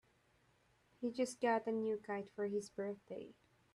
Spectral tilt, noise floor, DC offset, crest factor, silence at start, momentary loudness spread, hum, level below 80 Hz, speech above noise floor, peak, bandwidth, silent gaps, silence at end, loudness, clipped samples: -5 dB/octave; -74 dBFS; under 0.1%; 18 dB; 1 s; 14 LU; none; -84 dBFS; 34 dB; -26 dBFS; 12.5 kHz; none; 0.4 s; -41 LUFS; under 0.1%